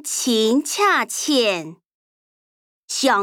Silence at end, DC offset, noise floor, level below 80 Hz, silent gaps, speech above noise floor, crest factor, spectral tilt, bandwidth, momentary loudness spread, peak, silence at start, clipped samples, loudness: 0 s; under 0.1%; under -90 dBFS; -76 dBFS; 1.94-2.88 s; over 71 dB; 16 dB; -1.5 dB/octave; 19.5 kHz; 10 LU; -6 dBFS; 0.05 s; under 0.1%; -19 LUFS